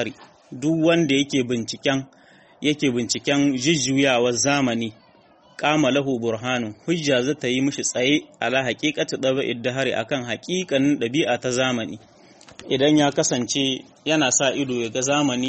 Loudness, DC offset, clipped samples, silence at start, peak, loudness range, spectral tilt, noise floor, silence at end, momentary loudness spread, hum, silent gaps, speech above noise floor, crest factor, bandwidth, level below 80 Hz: -21 LUFS; under 0.1%; under 0.1%; 0 s; -4 dBFS; 2 LU; -3.5 dB/octave; -53 dBFS; 0 s; 8 LU; none; none; 32 dB; 18 dB; 8.8 kHz; -60 dBFS